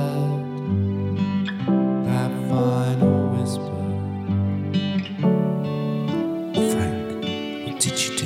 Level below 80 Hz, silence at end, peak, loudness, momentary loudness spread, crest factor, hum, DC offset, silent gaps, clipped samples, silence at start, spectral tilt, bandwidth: -56 dBFS; 0 s; -6 dBFS; -23 LUFS; 7 LU; 16 dB; none; under 0.1%; none; under 0.1%; 0 s; -6 dB/octave; 16 kHz